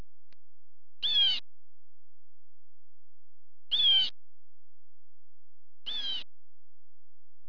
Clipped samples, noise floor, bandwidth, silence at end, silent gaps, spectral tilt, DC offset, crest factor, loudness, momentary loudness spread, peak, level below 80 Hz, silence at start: under 0.1%; under -90 dBFS; 5.4 kHz; 1.25 s; none; -1.5 dB/octave; 2%; 18 dB; -26 LUFS; 15 LU; -16 dBFS; -80 dBFS; 1 s